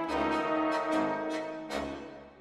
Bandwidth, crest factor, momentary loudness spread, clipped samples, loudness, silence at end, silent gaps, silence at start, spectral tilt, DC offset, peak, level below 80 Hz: 13 kHz; 14 dB; 10 LU; under 0.1%; -32 LUFS; 0 s; none; 0 s; -5 dB/octave; under 0.1%; -18 dBFS; -58 dBFS